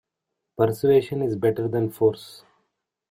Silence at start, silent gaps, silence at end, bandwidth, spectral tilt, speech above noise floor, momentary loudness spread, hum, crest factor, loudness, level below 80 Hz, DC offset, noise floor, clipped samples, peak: 0.6 s; none; 0.75 s; 16 kHz; -7.5 dB/octave; 60 dB; 19 LU; none; 18 dB; -23 LUFS; -60 dBFS; under 0.1%; -82 dBFS; under 0.1%; -8 dBFS